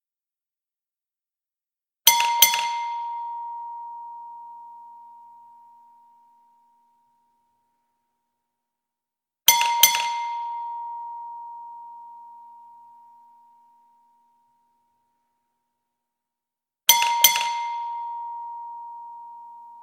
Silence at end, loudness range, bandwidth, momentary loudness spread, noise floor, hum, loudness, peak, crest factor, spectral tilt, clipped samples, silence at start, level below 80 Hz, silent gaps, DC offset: 0 s; 18 LU; 17 kHz; 25 LU; under -90 dBFS; none; -20 LUFS; 0 dBFS; 28 dB; 4 dB/octave; under 0.1%; 2.05 s; -82 dBFS; none; under 0.1%